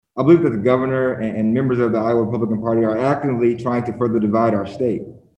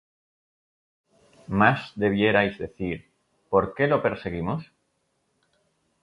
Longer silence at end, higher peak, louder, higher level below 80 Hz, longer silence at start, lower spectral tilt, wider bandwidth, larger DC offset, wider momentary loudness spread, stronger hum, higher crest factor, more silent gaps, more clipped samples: second, 0.2 s vs 1.4 s; about the same, -2 dBFS vs -4 dBFS; first, -18 LUFS vs -24 LUFS; about the same, -52 dBFS vs -52 dBFS; second, 0.15 s vs 1.5 s; first, -9.5 dB/octave vs -8 dB/octave; second, 8.2 kHz vs 9.6 kHz; neither; second, 7 LU vs 12 LU; neither; second, 16 dB vs 22 dB; neither; neither